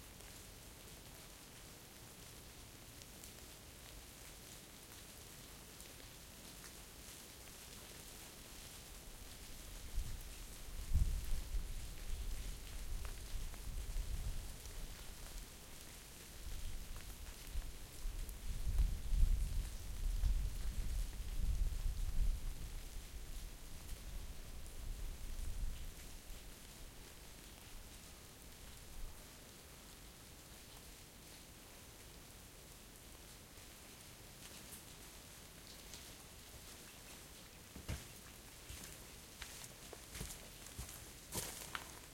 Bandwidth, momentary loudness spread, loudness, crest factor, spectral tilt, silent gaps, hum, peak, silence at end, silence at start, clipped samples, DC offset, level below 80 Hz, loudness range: 16.5 kHz; 12 LU; -50 LUFS; 24 dB; -3.5 dB/octave; none; none; -20 dBFS; 0 s; 0 s; under 0.1%; under 0.1%; -46 dBFS; 11 LU